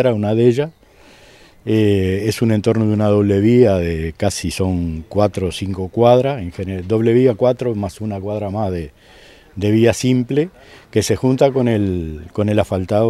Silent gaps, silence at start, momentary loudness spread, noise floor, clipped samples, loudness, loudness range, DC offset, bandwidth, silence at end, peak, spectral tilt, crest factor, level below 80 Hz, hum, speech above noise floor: none; 0 s; 11 LU; -46 dBFS; under 0.1%; -17 LUFS; 3 LU; under 0.1%; 13.5 kHz; 0 s; 0 dBFS; -7 dB/octave; 16 dB; -44 dBFS; none; 30 dB